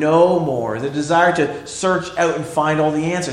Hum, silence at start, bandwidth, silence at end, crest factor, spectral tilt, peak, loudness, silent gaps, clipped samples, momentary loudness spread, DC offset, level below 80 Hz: none; 0 s; 12 kHz; 0 s; 16 dB; -5.5 dB/octave; -2 dBFS; -18 LUFS; none; under 0.1%; 8 LU; under 0.1%; -52 dBFS